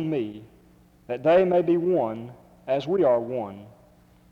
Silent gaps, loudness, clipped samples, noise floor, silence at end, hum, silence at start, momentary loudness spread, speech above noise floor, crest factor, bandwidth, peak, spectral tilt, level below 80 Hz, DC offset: none; -24 LUFS; under 0.1%; -56 dBFS; 0.6 s; none; 0 s; 22 LU; 32 dB; 16 dB; 6.6 kHz; -8 dBFS; -8.5 dB/octave; -62 dBFS; under 0.1%